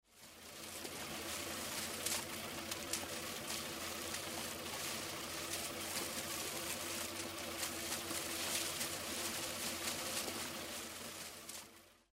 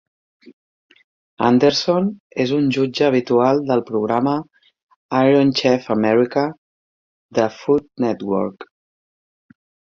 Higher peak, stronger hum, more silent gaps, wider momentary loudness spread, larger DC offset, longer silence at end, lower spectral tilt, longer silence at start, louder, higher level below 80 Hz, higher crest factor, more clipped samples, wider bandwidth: second, -24 dBFS vs -2 dBFS; neither; second, none vs 0.53-0.90 s, 1.04-1.37 s, 2.20-2.30 s, 4.83-4.87 s, 4.96-5.09 s, 6.58-7.29 s; about the same, 8 LU vs 8 LU; neither; second, 0.15 s vs 1.3 s; second, -1.5 dB/octave vs -6 dB/octave; second, 0.1 s vs 0.45 s; second, -41 LUFS vs -18 LUFS; second, -68 dBFS vs -60 dBFS; about the same, 20 dB vs 16 dB; neither; first, 16 kHz vs 7.4 kHz